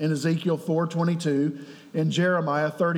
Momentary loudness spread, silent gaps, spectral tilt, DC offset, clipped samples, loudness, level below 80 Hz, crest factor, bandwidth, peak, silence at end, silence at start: 6 LU; none; -6.5 dB/octave; under 0.1%; under 0.1%; -25 LUFS; -86 dBFS; 12 dB; 13 kHz; -12 dBFS; 0 s; 0 s